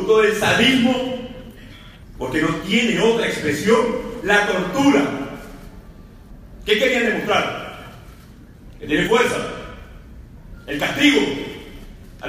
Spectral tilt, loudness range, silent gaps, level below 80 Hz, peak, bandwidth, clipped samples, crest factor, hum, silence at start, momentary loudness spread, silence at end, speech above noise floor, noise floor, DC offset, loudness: -4 dB/octave; 4 LU; none; -42 dBFS; -2 dBFS; 15.5 kHz; under 0.1%; 20 dB; none; 0 s; 22 LU; 0 s; 25 dB; -42 dBFS; under 0.1%; -18 LUFS